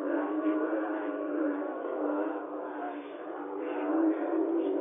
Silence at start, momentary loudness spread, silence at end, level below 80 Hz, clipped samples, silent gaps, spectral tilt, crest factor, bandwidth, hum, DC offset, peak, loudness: 0 s; 10 LU; 0 s; under -90 dBFS; under 0.1%; none; 1.5 dB/octave; 14 dB; 3.7 kHz; none; under 0.1%; -18 dBFS; -32 LUFS